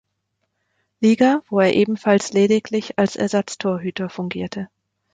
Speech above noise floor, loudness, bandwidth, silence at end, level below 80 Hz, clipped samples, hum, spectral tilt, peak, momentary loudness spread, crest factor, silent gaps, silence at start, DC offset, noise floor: 55 dB; -19 LUFS; 9.4 kHz; 0.5 s; -60 dBFS; under 0.1%; none; -5.5 dB/octave; -4 dBFS; 11 LU; 16 dB; none; 1 s; under 0.1%; -74 dBFS